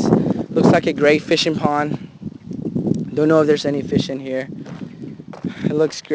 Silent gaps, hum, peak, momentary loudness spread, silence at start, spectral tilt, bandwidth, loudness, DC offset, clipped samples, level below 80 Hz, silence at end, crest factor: none; none; 0 dBFS; 18 LU; 0 s; -6 dB/octave; 8 kHz; -18 LUFS; under 0.1%; under 0.1%; -50 dBFS; 0 s; 18 dB